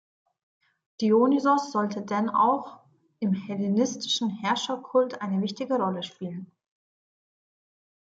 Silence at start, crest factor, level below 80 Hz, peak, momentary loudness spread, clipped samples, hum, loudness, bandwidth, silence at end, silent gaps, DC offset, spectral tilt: 1 s; 18 dB; -76 dBFS; -10 dBFS; 11 LU; under 0.1%; none; -26 LUFS; 8 kHz; 1.65 s; none; under 0.1%; -5 dB/octave